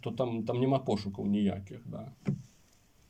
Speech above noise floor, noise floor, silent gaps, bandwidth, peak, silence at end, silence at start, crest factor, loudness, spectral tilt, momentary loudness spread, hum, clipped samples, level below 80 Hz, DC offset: 32 dB; -64 dBFS; none; 8.8 kHz; -16 dBFS; 0.65 s; 0.05 s; 18 dB; -33 LUFS; -8 dB/octave; 14 LU; none; under 0.1%; -66 dBFS; under 0.1%